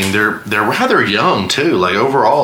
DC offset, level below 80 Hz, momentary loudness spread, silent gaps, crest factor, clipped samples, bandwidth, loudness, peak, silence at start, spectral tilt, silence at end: under 0.1%; -52 dBFS; 3 LU; none; 12 dB; under 0.1%; 20 kHz; -13 LUFS; 0 dBFS; 0 s; -4.5 dB/octave; 0 s